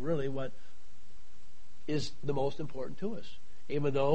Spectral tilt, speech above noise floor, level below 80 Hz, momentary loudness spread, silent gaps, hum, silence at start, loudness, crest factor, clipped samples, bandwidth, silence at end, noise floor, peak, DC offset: -6.5 dB/octave; 28 dB; -58 dBFS; 14 LU; none; none; 0 s; -36 LUFS; 20 dB; under 0.1%; 8.4 kHz; 0 s; -62 dBFS; -14 dBFS; 3%